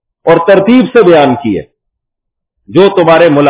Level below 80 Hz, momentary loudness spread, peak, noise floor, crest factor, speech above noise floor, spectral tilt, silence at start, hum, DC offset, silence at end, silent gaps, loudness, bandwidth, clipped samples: -46 dBFS; 8 LU; 0 dBFS; -74 dBFS; 8 dB; 68 dB; -10.5 dB/octave; 0.25 s; none; under 0.1%; 0 s; none; -7 LUFS; 4 kHz; 5%